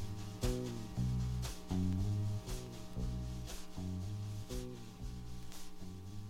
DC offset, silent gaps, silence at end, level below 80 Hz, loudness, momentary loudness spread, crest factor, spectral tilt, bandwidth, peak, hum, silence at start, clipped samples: under 0.1%; none; 0 s; -48 dBFS; -42 LUFS; 12 LU; 16 dB; -6 dB/octave; 16 kHz; -24 dBFS; none; 0 s; under 0.1%